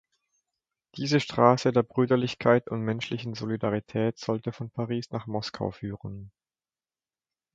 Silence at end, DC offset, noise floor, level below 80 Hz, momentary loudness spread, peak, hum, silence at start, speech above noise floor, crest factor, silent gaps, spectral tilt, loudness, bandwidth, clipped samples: 1.25 s; under 0.1%; under -90 dBFS; -62 dBFS; 14 LU; -4 dBFS; none; 0.95 s; over 63 dB; 24 dB; none; -6.5 dB/octave; -27 LUFS; 7.8 kHz; under 0.1%